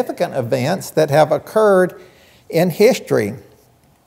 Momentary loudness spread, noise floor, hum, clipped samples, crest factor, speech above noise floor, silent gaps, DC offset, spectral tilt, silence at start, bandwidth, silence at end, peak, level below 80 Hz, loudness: 8 LU; -53 dBFS; none; under 0.1%; 16 dB; 37 dB; none; under 0.1%; -6 dB/octave; 0 s; 16 kHz; 0.7 s; 0 dBFS; -62 dBFS; -16 LUFS